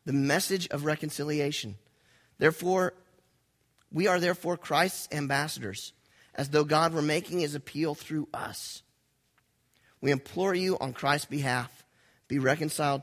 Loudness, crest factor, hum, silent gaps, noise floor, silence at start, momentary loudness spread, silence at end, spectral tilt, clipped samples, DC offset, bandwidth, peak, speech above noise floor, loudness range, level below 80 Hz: -29 LUFS; 24 dB; none; none; -72 dBFS; 0.05 s; 11 LU; 0 s; -4.5 dB/octave; under 0.1%; under 0.1%; 16 kHz; -6 dBFS; 43 dB; 4 LU; -66 dBFS